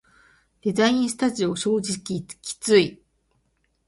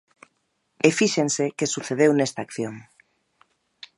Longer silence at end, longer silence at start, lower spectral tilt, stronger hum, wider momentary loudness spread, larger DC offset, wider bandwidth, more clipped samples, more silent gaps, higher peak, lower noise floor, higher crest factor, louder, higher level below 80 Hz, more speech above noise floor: second, 0.95 s vs 1.15 s; second, 0.65 s vs 0.85 s; about the same, -4 dB/octave vs -4 dB/octave; neither; about the same, 11 LU vs 12 LU; neither; about the same, 11.5 kHz vs 11.5 kHz; neither; neither; about the same, -4 dBFS vs -2 dBFS; about the same, -69 dBFS vs -72 dBFS; about the same, 20 dB vs 24 dB; about the same, -23 LUFS vs -23 LUFS; first, -60 dBFS vs -70 dBFS; about the same, 47 dB vs 50 dB